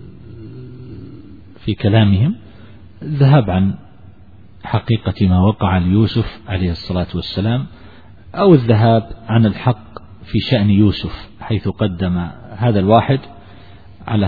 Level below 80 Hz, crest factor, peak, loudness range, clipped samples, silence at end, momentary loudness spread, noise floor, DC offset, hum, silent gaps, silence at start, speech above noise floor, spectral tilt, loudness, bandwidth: -38 dBFS; 16 dB; 0 dBFS; 3 LU; under 0.1%; 0 s; 22 LU; -43 dBFS; 0.7%; none; none; 0 s; 29 dB; -10 dB/octave; -16 LUFS; 4.9 kHz